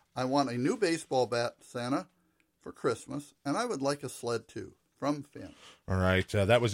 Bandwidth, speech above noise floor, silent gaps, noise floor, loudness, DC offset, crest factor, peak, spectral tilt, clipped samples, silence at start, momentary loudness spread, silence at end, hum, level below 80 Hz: 16 kHz; 39 dB; none; -71 dBFS; -32 LUFS; under 0.1%; 22 dB; -10 dBFS; -5.5 dB/octave; under 0.1%; 0.15 s; 20 LU; 0 s; none; -62 dBFS